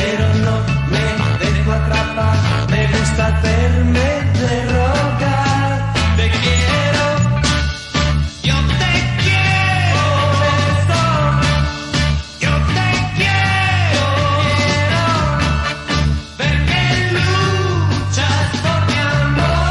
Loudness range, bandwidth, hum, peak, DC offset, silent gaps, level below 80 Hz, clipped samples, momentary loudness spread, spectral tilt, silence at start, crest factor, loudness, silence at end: 1 LU; 11.5 kHz; none; -4 dBFS; under 0.1%; none; -26 dBFS; under 0.1%; 3 LU; -5 dB/octave; 0 s; 12 dB; -15 LUFS; 0 s